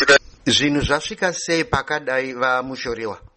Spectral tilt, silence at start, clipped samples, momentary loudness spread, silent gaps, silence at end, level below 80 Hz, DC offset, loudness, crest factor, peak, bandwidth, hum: -3 dB/octave; 0 s; under 0.1%; 10 LU; none; 0.2 s; -42 dBFS; under 0.1%; -20 LUFS; 18 dB; -2 dBFS; 8.8 kHz; none